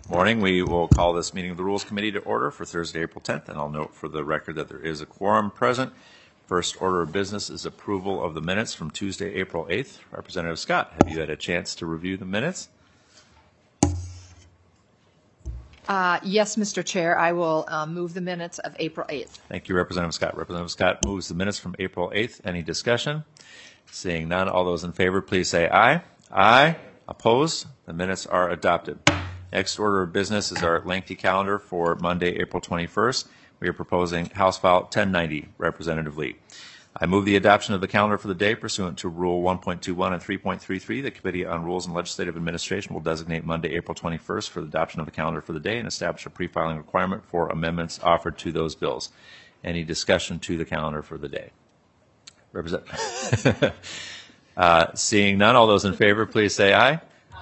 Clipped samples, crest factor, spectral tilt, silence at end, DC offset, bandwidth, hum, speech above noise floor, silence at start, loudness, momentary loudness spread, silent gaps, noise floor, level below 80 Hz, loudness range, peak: under 0.1%; 24 dB; -4.5 dB/octave; 0 s; under 0.1%; 9 kHz; none; 37 dB; 0.05 s; -24 LUFS; 13 LU; none; -61 dBFS; -48 dBFS; 8 LU; 0 dBFS